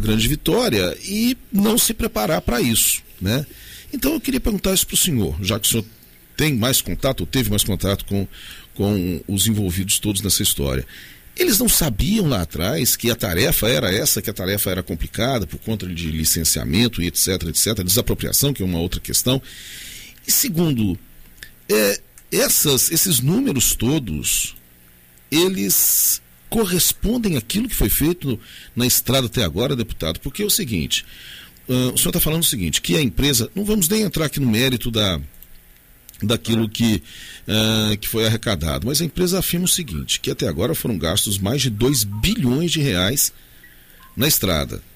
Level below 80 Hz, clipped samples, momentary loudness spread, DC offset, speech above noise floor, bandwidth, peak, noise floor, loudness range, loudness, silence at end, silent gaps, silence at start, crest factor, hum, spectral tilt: -34 dBFS; under 0.1%; 9 LU; under 0.1%; 29 dB; 16 kHz; -4 dBFS; -49 dBFS; 3 LU; -19 LUFS; 0.15 s; none; 0 s; 16 dB; none; -3.5 dB/octave